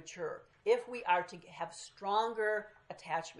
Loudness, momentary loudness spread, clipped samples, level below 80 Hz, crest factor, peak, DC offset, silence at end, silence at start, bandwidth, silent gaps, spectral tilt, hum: -36 LUFS; 11 LU; under 0.1%; -78 dBFS; 20 dB; -16 dBFS; under 0.1%; 0 s; 0 s; 11 kHz; none; -3 dB/octave; none